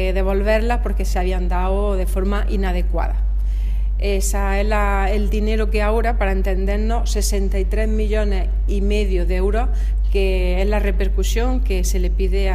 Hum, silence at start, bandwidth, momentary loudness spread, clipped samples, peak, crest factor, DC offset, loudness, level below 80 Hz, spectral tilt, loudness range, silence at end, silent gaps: none; 0 s; 14.5 kHz; 3 LU; under 0.1%; -4 dBFS; 12 dB; under 0.1%; -20 LUFS; -18 dBFS; -6 dB/octave; 1 LU; 0 s; none